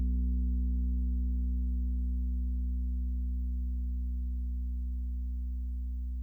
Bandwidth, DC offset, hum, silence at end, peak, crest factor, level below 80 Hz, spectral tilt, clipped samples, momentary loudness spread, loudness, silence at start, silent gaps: 0.5 kHz; under 0.1%; 60 Hz at -85 dBFS; 0 s; -24 dBFS; 8 dB; -32 dBFS; -12 dB/octave; under 0.1%; 5 LU; -35 LUFS; 0 s; none